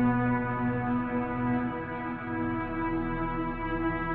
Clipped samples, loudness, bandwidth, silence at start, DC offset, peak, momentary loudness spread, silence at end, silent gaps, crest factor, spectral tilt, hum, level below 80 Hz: under 0.1%; -31 LUFS; 4.2 kHz; 0 s; under 0.1%; -16 dBFS; 5 LU; 0 s; none; 14 dB; -7 dB/octave; none; -44 dBFS